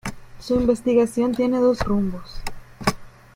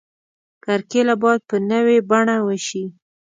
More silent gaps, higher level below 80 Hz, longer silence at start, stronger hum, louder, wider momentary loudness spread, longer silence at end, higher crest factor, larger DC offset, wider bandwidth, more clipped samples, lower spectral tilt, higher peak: neither; first, -40 dBFS vs -70 dBFS; second, 0.05 s vs 0.65 s; neither; second, -21 LUFS vs -18 LUFS; first, 17 LU vs 12 LU; about the same, 0.25 s vs 0.35 s; about the same, 20 dB vs 18 dB; neither; first, 16.5 kHz vs 9.4 kHz; neither; about the same, -6 dB/octave vs -5 dB/octave; about the same, -2 dBFS vs -2 dBFS